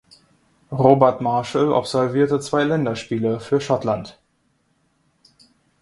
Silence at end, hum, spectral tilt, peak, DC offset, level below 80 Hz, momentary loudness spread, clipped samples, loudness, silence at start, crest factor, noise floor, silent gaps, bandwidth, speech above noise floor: 1.7 s; none; -6.5 dB/octave; 0 dBFS; under 0.1%; -58 dBFS; 9 LU; under 0.1%; -20 LUFS; 0.7 s; 20 dB; -66 dBFS; none; 11.5 kHz; 47 dB